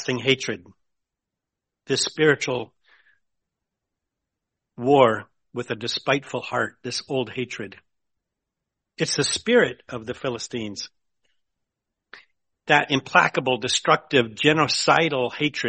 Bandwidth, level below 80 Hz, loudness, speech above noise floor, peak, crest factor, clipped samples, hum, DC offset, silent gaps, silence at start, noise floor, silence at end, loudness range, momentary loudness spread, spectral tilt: 8.8 kHz; -64 dBFS; -22 LUFS; 63 dB; -2 dBFS; 22 dB; under 0.1%; none; under 0.1%; none; 0 s; -85 dBFS; 0 s; 8 LU; 15 LU; -3.5 dB/octave